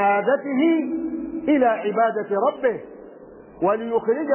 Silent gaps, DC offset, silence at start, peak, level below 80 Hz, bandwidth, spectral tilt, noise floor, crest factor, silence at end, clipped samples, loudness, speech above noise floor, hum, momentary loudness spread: none; under 0.1%; 0 s; -8 dBFS; -60 dBFS; 3.2 kHz; -10 dB/octave; -43 dBFS; 14 dB; 0 s; under 0.1%; -22 LUFS; 23 dB; none; 9 LU